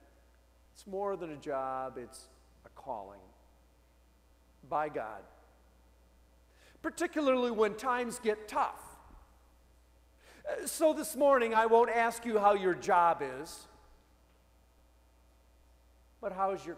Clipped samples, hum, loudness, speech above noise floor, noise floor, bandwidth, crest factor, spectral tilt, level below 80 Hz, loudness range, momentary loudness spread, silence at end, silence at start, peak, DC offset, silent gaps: under 0.1%; none; -32 LUFS; 33 dB; -65 dBFS; 16 kHz; 20 dB; -4 dB/octave; -64 dBFS; 15 LU; 20 LU; 0 s; 0.8 s; -14 dBFS; under 0.1%; none